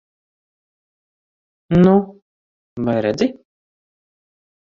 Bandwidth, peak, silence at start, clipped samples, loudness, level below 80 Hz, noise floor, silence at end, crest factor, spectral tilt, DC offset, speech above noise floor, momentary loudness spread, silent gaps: 7 kHz; -2 dBFS; 1.7 s; under 0.1%; -17 LUFS; -50 dBFS; under -90 dBFS; 1.4 s; 20 dB; -8.5 dB/octave; under 0.1%; over 75 dB; 17 LU; 2.22-2.76 s